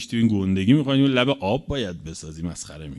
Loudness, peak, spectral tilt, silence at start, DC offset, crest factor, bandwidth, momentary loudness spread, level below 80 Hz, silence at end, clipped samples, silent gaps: -22 LUFS; -4 dBFS; -6 dB/octave; 0 s; under 0.1%; 18 dB; 12 kHz; 15 LU; -44 dBFS; 0 s; under 0.1%; none